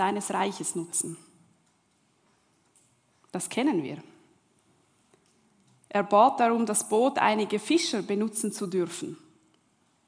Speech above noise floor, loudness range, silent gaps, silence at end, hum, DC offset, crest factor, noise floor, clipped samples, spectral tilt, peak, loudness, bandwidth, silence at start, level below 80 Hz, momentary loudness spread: 42 dB; 10 LU; none; 0.9 s; none; under 0.1%; 22 dB; -69 dBFS; under 0.1%; -3.5 dB/octave; -8 dBFS; -26 LUFS; 10.5 kHz; 0 s; -82 dBFS; 17 LU